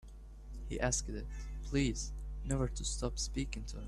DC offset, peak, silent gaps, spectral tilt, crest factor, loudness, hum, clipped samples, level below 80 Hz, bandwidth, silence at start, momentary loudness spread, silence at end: under 0.1%; -20 dBFS; none; -4 dB/octave; 18 dB; -38 LUFS; none; under 0.1%; -42 dBFS; 12 kHz; 0.05 s; 14 LU; 0 s